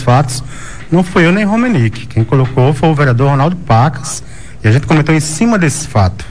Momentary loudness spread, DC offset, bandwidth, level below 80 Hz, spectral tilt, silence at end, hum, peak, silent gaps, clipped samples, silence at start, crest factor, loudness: 9 LU; 4%; 11 kHz; -34 dBFS; -6 dB/octave; 0 s; none; 0 dBFS; none; under 0.1%; 0 s; 10 dB; -12 LUFS